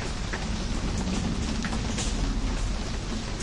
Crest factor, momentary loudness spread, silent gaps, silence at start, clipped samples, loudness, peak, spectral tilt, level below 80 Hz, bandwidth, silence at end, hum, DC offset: 14 dB; 3 LU; none; 0 s; under 0.1%; -30 LUFS; -16 dBFS; -4.5 dB/octave; -32 dBFS; 11.5 kHz; 0 s; none; under 0.1%